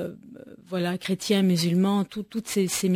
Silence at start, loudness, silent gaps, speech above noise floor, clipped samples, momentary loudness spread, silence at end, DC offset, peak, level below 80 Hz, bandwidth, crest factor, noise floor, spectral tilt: 0 s; -25 LUFS; none; 21 dB; under 0.1%; 13 LU; 0 s; under 0.1%; -12 dBFS; -64 dBFS; 16 kHz; 14 dB; -46 dBFS; -5 dB/octave